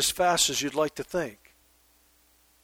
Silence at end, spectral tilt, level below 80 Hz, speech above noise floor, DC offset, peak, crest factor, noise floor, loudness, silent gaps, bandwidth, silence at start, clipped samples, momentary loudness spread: 1.3 s; -1.5 dB/octave; -58 dBFS; 36 dB; under 0.1%; -10 dBFS; 18 dB; -63 dBFS; -26 LUFS; none; over 20 kHz; 0 s; under 0.1%; 10 LU